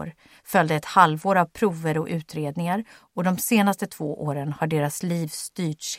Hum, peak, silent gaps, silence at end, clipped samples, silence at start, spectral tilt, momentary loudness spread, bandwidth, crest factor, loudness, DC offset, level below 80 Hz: none; -2 dBFS; none; 0 s; under 0.1%; 0 s; -5 dB/octave; 11 LU; 16.5 kHz; 22 dB; -24 LUFS; under 0.1%; -62 dBFS